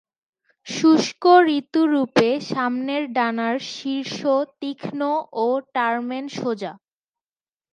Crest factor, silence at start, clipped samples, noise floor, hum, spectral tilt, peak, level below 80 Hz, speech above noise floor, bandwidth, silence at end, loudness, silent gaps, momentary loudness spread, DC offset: 20 dB; 0.65 s; under 0.1%; under -90 dBFS; none; -4.5 dB/octave; -2 dBFS; -74 dBFS; over 69 dB; 9.8 kHz; 0.95 s; -21 LUFS; none; 13 LU; under 0.1%